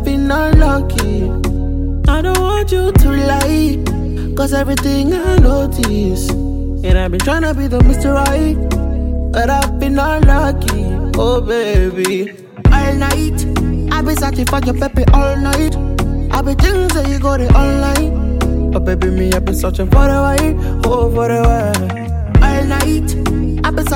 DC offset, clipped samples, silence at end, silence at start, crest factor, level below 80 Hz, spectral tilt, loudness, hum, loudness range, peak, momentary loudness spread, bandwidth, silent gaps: 0.5%; under 0.1%; 0 s; 0 s; 12 dB; -16 dBFS; -6 dB/octave; -14 LUFS; none; 1 LU; 0 dBFS; 6 LU; 17 kHz; none